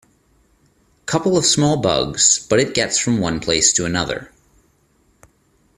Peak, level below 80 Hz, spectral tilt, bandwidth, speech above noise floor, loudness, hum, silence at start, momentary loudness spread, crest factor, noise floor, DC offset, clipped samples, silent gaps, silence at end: 0 dBFS; -48 dBFS; -3 dB/octave; 14.5 kHz; 42 dB; -16 LUFS; none; 1.05 s; 9 LU; 20 dB; -59 dBFS; under 0.1%; under 0.1%; none; 1.5 s